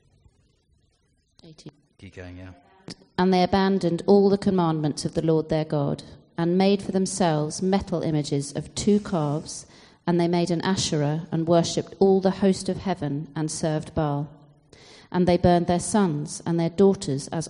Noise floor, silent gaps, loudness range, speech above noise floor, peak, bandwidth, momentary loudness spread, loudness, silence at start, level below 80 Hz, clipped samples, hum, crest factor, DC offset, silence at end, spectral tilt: -67 dBFS; none; 3 LU; 44 dB; -6 dBFS; 10.5 kHz; 11 LU; -23 LUFS; 1.45 s; -50 dBFS; under 0.1%; none; 18 dB; under 0.1%; 0 s; -6 dB/octave